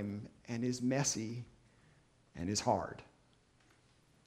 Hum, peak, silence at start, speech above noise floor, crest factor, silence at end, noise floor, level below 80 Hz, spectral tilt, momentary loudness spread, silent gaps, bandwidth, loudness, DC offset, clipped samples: none; -18 dBFS; 0 s; 33 dB; 22 dB; 1.2 s; -69 dBFS; -66 dBFS; -4.5 dB/octave; 18 LU; none; 13.5 kHz; -37 LUFS; under 0.1%; under 0.1%